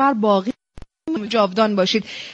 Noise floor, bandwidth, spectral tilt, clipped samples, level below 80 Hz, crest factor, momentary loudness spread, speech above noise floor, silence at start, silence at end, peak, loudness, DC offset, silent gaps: -39 dBFS; 8 kHz; -5.5 dB/octave; under 0.1%; -52 dBFS; 16 dB; 13 LU; 20 dB; 0 s; 0 s; -4 dBFS; -19 LUFS; under 0.1%; none